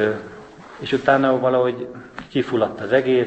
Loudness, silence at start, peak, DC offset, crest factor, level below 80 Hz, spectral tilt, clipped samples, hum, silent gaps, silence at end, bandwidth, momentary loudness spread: -20 LUFS; 0 s; -2 dBFS; under 0.1%; 20 dB; -58 dBFS; -7 dB/octave; under 0.1%; none; none; 0 s; 8.4 kHz; 20 LU